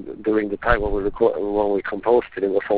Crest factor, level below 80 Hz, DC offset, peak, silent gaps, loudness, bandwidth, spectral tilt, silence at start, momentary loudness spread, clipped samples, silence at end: 18 dB; -36 dBFS; 0.2%; -2 dBFS; none; -21 LUFS; 4 kHz; -10 dB/octave; 0 s; 3 LU; under 0.1%; 0 s